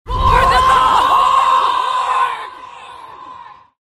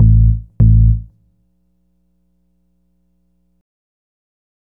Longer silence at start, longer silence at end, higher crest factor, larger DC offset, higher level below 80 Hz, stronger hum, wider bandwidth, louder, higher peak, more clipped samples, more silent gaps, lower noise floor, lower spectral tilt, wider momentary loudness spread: about the same, 0.05 s vs 0 s; second, 0.3 s vs 3.75 s; about the same, 14 dB vs 16 dB; neither; second, -28 dBFS vs -20 dBFS; second, none vs 60 Hz at -55 dBFS; first, 15 kHz vs 1 kHz; about the same, -13 LUFS vs -13 LUFS; about the same, 0 dBFS vs 0 dBFS; neither; neither; second, -37 dBFS vs -62 dBFS; second, -3.5 dB/octave vs -15 dB/octave; first, 23 LU vs 6 LU